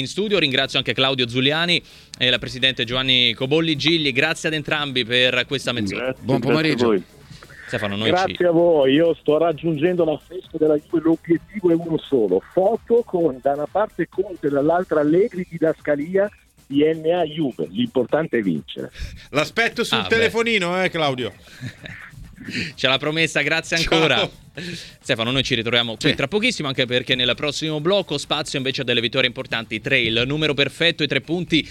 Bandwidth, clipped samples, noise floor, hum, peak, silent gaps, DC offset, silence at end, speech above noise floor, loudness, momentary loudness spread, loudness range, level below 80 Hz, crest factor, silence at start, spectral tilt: 15 kHz; under 0.1%; -42 dBFS; none; 0 dBFS; none; under 0.1%; 0 s; 22 dB; -20 LUFS; 9 LU; 3 LU; -48 dBFS; 20 dB; 0 s; -4.5 dB/octave